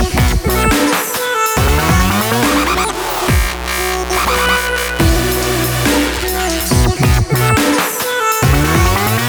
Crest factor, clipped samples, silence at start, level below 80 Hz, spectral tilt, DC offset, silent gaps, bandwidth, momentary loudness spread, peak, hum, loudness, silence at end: 12 dB; under 0.1%; 0 s; -20 dBFS; -4 dB/octave; under 0.1%; none; over 20 kHz; 4 LU; 0 dBFS; none; -13 LUFS; 0 s